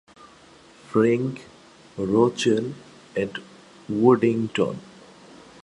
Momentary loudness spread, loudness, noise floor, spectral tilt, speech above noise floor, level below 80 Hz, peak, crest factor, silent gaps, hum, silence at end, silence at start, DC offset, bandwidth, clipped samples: 19 LU; -23 LUFS; -51 dBFS; -6.5 dB/octave; 29 dB; -62 dBFS; -4 dBFS; 22 dB; none; none; 0.85 s; 0.9 s; under 0.1%; 11 kHz; under 0.1%